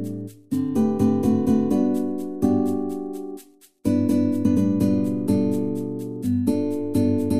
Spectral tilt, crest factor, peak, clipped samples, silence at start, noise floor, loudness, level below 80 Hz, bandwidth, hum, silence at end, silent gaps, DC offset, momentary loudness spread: -8.5 dB/octave; 14 dB; -8 dBFS; under 0.1%; 0 s; -47 dBFS; -22 LUFS; -52 dBFS; 15 kHz; none; 0 s; none; 0.9%; 10 LU